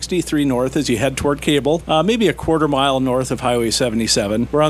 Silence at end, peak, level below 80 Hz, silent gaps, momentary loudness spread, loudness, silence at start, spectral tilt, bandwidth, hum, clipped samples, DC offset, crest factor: 0 s; -4 dBFS; -38 dBFS; none; 3 LU; -17 LUFS; 0 s; -4.5 dB/octave; 15.5 kHz; none; under 0.1%; under 0.1%; 14 dB